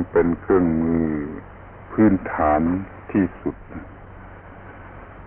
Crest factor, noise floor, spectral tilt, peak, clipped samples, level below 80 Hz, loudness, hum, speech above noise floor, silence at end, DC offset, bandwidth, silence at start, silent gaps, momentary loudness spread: 16 dB; -41 dBFS; -13 dB/octave; -6 dBFS; under 0.1%; -40 dBFS; -21 LUFS; none; 21 dB; 0 s; under 0.1%; 3.3 kHz; 0 s; none; 23 LU